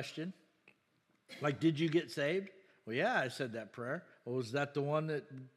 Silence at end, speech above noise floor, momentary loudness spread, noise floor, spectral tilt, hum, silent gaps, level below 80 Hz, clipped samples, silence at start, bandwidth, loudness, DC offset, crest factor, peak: 0.1 s; 40 dB; 11 LU; -76 dBFS; -6 dB/octave; none; none; under -90 dBFS; under 0.1%; 0 s; 13 kHz; -37 LUFS; under 0.1%; 18 dB; -20 dBFS